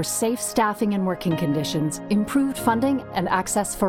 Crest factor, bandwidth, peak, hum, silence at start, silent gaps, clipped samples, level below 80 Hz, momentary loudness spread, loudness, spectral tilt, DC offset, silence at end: 16 dB; 18 kHz; -8 dBFS; none; 0 s; none; under 0.1%; -50 dBFS; 3 LU; -23 LUFS; -4.5 dB/octave; under 0.1%; 0 s